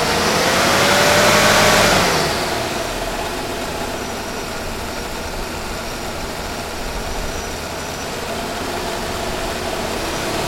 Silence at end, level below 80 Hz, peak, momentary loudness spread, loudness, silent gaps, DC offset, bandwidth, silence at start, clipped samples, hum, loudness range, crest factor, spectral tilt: 0 s; -34 dBFS; 0 dBFS; 14 LU; -18 LUFS; none; under 0.1%; 16.5 kHz; 0 s; under 0.1%; none; 11 LU; 20 dB; -3 dB/octave